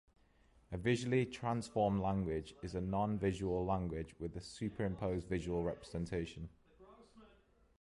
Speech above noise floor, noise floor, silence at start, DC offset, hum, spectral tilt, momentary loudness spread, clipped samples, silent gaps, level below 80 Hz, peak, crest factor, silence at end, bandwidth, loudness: 31 dB; -69 dBFS; 0.7 s; under 0.1%; none; -7 dB/octave; 11 LU; under 0.1%; none; -56 dBFS; -22 dBFS; 18 dB; 0.55 s; 11.5 kHz; -39 LUFS